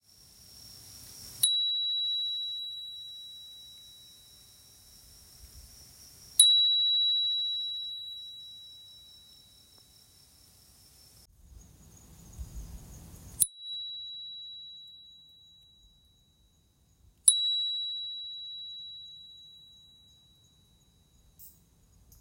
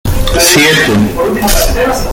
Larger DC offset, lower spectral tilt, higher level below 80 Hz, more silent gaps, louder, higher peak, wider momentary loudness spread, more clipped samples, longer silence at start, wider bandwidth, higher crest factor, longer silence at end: neither; second, 1.5 dB/octave vs -3.5 dB/octave; second, -58 dBFS vs -16 dBFS; neither; second, -27 LUFS vs -8 LUFS; second, -4 dBFS vs 0 dBFS; first, 28 LU vs 7 LU; second, under 0.1% vs 0.1%; first, 0.5 s vs 0.05 s; second, 16 kHz vs over 20 kHz; first, 32 dB vs 10 dB; first, 0.7 s vs 0 s